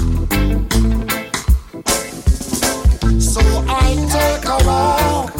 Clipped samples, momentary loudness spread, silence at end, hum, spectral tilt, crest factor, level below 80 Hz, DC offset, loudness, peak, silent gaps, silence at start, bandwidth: under 0.1%; 5 LU; 0 s; none; -4.5 dB/octave; 12 dB; -18 dBFS; under 0.1%; -16 LUFS; -2 dBFS; none; 0 s; 17 kHz